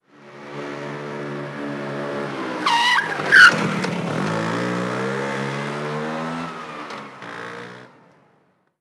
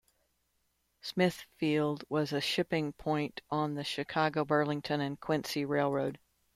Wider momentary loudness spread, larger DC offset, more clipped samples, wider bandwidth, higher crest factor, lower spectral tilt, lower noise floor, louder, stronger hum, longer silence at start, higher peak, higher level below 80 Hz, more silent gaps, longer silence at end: first, 20 LU vs 5 LU; neither; neither; about the same, 14.5 kHz vs 15.5 kHz; about the same, 22 dB vs 18 dB; second, -4 dB/octave vs -5.5 dB/octave; second, -62 dBFS vs -77 dBFS; first, -20 LUFS vs -33 LUFS; neither; second, 0.2 s vs 1.05 s; first, 0 dBFS vs -14 dBFS; about the same, -72 dBFS vs -68 dBFS; neither; first, 0.95 s vs 0.4 s